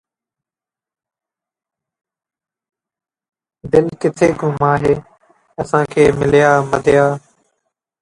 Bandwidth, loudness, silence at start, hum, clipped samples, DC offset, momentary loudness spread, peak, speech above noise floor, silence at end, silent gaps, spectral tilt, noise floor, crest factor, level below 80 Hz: 11 kHz; -14 LUFS; 3.65 s; none; under 0.1%; under 0.1%; 8 LU; 0 dBFS; 76 dB; 0.85 s; none; -6.5 dB/octave; -90 dBFS; 18 dB; -46 dBFS